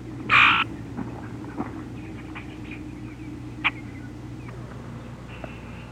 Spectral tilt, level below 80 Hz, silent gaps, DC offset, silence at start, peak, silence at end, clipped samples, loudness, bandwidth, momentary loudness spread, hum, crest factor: -5 dB/octave; -48 dBFS; none; under 0.1%; 0 s; -6 dBFS; 0 s; under 0.1%; -22 LUFS; 14 kHz; 21 LU; none; 22 dB